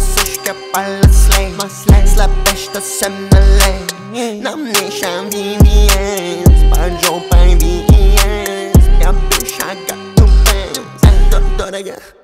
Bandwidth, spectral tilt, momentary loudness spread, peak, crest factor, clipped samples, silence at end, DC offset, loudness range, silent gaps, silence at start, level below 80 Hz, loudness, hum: 16.5 kHz; -4.5 dB/octave; 11 LU; 0 dBFS; 10 dB; under 0.1%; 0.3 s; under 0.1%; 2 LU; none; 0 s; -12 dBFS; -13 LUFS; none